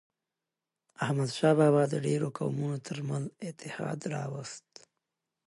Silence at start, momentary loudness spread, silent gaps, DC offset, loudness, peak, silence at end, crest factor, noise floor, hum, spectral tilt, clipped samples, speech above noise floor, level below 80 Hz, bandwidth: 1 s; 16 LU; none; under 0.1%; -31 LUFS; -14 dBFS; 0.9 s; 18 dB; -89 dBFS; none; -6.5 dB/octave; under 0.1%; 59 dB; -76 dBFS; 11.5 kHz